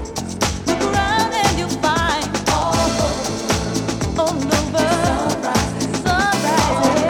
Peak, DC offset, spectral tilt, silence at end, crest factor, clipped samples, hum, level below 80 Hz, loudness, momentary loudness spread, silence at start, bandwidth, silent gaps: -2 dBFS; under 0.1%; -4 dB/octave; 0 s; 16 dB; under 0.1%; none; -32 dBFS; -18 LUFS; 5 LU; 0 s; 19 kHz; none